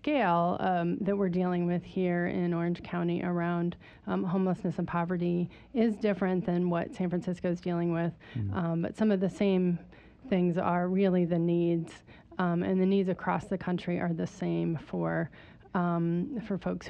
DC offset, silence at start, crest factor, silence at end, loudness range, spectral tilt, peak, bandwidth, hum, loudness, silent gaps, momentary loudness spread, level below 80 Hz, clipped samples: under 0.1%; 0.05 s; 14 dB; 0 s; 3 LU; -8.5 dB/octave; -14 dBFS; 8.2 kHz; none; -30 LUFS; none; 7 LU; -60 dBFS; under 0.1%